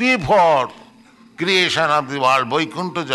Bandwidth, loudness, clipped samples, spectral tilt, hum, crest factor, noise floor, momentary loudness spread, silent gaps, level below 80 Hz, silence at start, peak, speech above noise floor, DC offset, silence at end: 12 kHz; -17 LUFS; under 0.1%; -4 dB/octave; none; 14 dB; -48 dBFS; 10 LU; none; -50 dBFS; 0 s; -4 dBFS; 31 dB; under 0.1%; 0 s